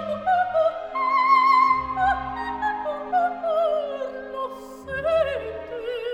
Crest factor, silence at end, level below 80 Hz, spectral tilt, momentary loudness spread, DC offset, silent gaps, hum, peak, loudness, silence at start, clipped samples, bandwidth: 16 dB; 0 s; -50 dBFS; -5 dB/octave; 15 LU; under 0.1%; none; none; -8 dBFS; -23 LUFS; 0 s; under 0.1%; 12 kHz